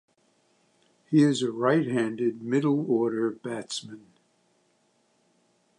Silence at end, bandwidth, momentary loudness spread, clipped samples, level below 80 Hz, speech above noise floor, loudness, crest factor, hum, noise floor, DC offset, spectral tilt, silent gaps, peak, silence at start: 1.8 s; 11 kHz; 13 LU; under 0.1%; -78 dBFS; 43 dB; -26 LUFS; 18 dB; none; -68 dBFS; under 0.1%; -6 dB/octave; none; -10 dBFS; 1.1 s